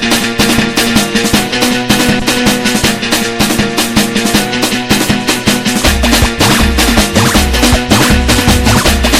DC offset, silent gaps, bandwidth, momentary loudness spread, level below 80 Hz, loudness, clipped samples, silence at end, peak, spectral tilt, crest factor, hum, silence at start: under 0.1%; none; 17.5 kHz; 3 LU; -20 dBFS; -9 LUFS; 0.3%; 0 s; 0 dBFS; -3.5 dB/octave; 10 dB; none; 0 s